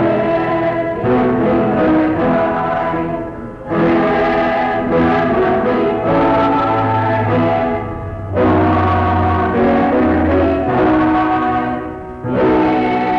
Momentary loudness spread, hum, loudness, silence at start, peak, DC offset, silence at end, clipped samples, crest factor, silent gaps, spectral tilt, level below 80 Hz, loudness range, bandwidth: 8 LU; none; -15 LUFS; 0 s; -6 dBFS; under 0.1%; 0 s; under 0.1%; 8 dB; none; -9 dB/octave; -36 dBFS; 2 LU; 6.2 kHz